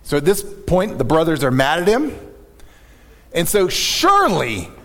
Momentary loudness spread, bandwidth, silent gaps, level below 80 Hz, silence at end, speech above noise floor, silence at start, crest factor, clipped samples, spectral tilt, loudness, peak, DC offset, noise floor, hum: 9 LU; 18.5 kHz; none; -36 dBFS; 0.05 s; 29 dB; 0.05 s; 16 dB; under 0.1%; -4 dB/octave; -17 LUFS; -2 dBFS; under 0.1%; -45 dBFS; none